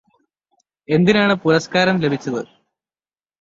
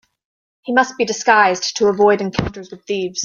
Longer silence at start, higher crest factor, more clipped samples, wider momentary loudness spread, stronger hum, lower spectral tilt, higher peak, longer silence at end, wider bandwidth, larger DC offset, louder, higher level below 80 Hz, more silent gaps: first, 0.9 s vs 0.65 s; about the same, 18 dB vs 16 dB; neither; about the same, 12 LU vs 13 LU; neither; first, -6 dB/octave vs -3.5 dB/octave; about the same, -2 dBFS vs -2 dBFS; first, 0.95 s vs 0 s; about the same, 7.8 kHz vs 7.4 kHz; neither; about the same, -17 LUFS vs -16 LUFS; second, -58 dBFS vs -46 dBFS; neither